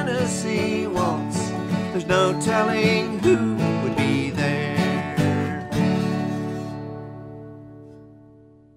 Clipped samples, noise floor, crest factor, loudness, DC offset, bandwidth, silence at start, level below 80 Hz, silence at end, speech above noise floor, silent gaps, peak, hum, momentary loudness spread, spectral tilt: under 0.1%; -50 dBFS; 18 dB; -22 LUFS; under 0.1%; 15.5 kHz; 0 s; -52 dBFS; 0.6 s; 29 dB; none; -6 dBFS; none; 16 LU; -6 dB/octave